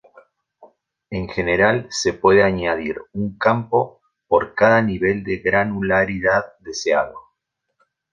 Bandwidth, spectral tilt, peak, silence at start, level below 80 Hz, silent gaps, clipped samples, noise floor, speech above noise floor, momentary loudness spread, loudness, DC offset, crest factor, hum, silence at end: 9.6 kHz; -5 dB/octave; -2 dBFS; 0.6 s; -46 dBFS; none; under 0.1%; -76 dBFS; 57 dB; 12 LU; -19 LUFS; under 0.1%; 18 dB; none; 0.9 s